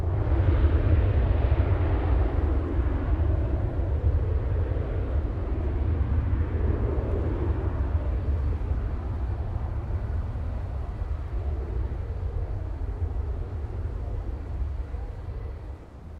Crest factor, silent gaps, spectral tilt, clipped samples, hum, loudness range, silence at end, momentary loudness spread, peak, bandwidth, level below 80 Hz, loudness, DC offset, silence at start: 16 dB; none; -10 dB/octave; under 0.1%; none; 8 LU; 0 s; 9 LU; -10 dBFS; 4.5 kHz; -28 dBFS; -28 LUFS; under 0.1%; 0 s